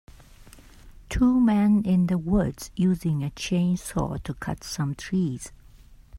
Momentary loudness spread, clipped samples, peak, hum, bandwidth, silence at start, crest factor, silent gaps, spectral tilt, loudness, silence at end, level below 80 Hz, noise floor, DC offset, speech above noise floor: 12 LU; under 0.1%; -10 dBFS; none; 15.5 kHz; 0.45 s; 14 dB; none; -6.5 dB/octave; -25 LUFS; 0 s; -42 dBFS; -50 dBFS; under 0.1%; 26 dB